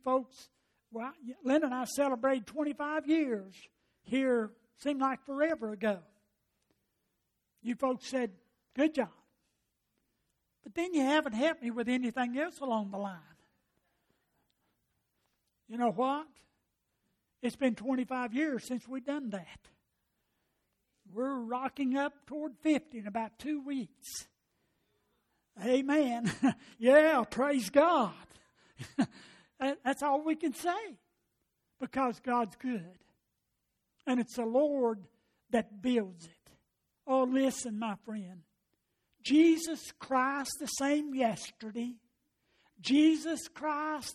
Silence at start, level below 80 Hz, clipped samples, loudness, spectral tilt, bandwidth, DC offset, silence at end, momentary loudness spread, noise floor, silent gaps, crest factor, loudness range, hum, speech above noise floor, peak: 0.05 s; -74 dBFS; under 0.1%; -32 LUFS; -4.5 dB/octave; 14.5 kHz; under 0.1%; 0 s; 14 LU; -83 dBFS; none; 22 dB; 9 LU; none; 51 dB; -12 dBFS